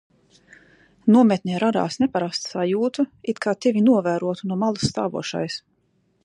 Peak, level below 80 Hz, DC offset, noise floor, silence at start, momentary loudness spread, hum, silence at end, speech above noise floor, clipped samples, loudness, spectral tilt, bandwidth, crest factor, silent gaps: -6 dBFS; -58 dBFS; under 0.1%; -66 dBFS; 1.05 s; 10 LU; none; 0.65 s; 45 dB; under 0.1%; -22 LUFS; -6 dB/octave; 10.5 kHz; 18 dB; none